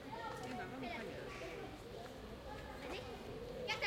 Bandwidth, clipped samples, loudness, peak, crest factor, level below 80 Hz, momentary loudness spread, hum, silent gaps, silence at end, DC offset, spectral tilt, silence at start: 16.5 kHz; under 0.1%; -48 LUFS; -26 dBFS; 20 dB; -60 dBFS; 5 LU; none; none; 0 s; under 0.1%; -4.5 dB/octave; 0 s